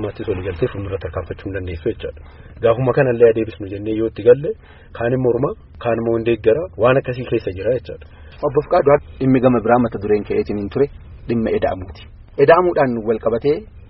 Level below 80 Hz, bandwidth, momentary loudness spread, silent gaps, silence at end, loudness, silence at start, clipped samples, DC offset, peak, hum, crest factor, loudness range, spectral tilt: -40 dBFS; 5.6 kHz; 13 LU; none; 0.1 s; -18 LUFS; 0 s; under 0.1%; under 0.1%; 0 dBFS; none; 18 dB; 2 LU; -6.5 dB/octave